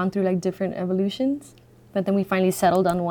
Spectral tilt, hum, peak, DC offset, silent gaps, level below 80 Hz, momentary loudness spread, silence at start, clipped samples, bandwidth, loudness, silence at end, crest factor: -6.5 dB/octave; none; -8 dBFS; under 0.1%; none; -58 dBFS; 8 LU; 0 s; under 0.1%; 19 kHz; -23 LUFS; 0 s; 14 dB